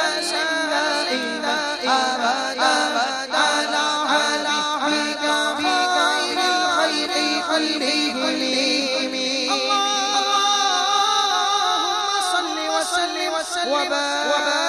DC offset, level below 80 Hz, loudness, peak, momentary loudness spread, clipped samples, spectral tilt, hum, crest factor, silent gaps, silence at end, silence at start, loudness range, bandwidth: under 0.1%; -64 dBFS; -20 LUFS; -6 dBFS; 4 LU; under 0.1%; 0 dB/octave; none; 16 dB; none; 0 s; 0 s; 1 LU; 14 kHz